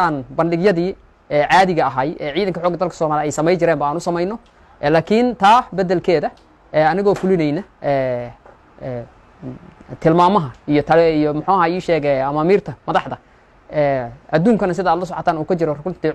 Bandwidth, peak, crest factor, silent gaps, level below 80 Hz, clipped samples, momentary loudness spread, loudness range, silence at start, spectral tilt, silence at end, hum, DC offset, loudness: 12 kHz; -2 dBFS; 16 dB; none; -48 dBFS; under 0.1%; 14 LU; 4 LU; 0 s; -6.5 dB/octave; 0 s; none; under 0.1%; -17 LUFS